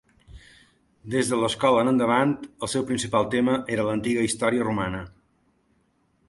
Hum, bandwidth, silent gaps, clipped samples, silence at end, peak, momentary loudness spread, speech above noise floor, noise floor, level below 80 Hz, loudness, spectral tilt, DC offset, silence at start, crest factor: none; 11.5 kHz; none; under 0.1%; 1.2 s; -6 dBFS; 8 LU; 43 dB; -67 dBFS; -54 dBFS; -24 LUFS; -5 dB/octave; under 0.1%; 0.3 s; 18 dB